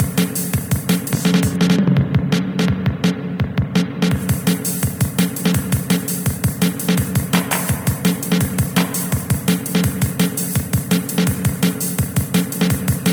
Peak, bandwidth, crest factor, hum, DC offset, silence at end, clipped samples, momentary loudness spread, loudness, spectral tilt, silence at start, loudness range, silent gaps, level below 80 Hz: -2 dBFS; over 20 kHz; 16 dB; none; under 0.1%; 0 s; under 0.1%; 4 LU; -18 LUFS; -5 dB/octave; 0 s; 1 LU; none; -36 dBFS